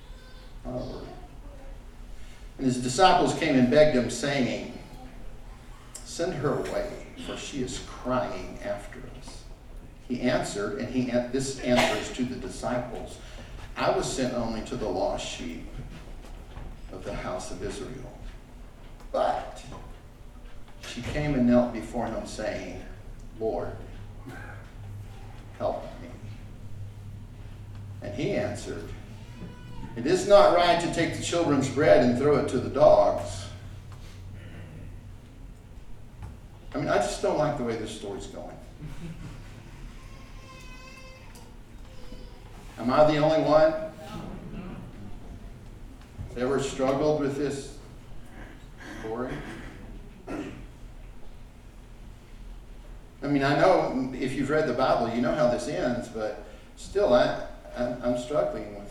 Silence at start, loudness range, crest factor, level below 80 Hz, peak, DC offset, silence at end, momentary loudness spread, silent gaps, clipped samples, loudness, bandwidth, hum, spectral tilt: 0 s; 15 LU; 24 dB; -44 dBFS; -4 dBFS; under 0.1%; 0 s; 25 LU; none; under 0.1%; -26 LUFS; 13 kHz; none; -5.5 dB/octave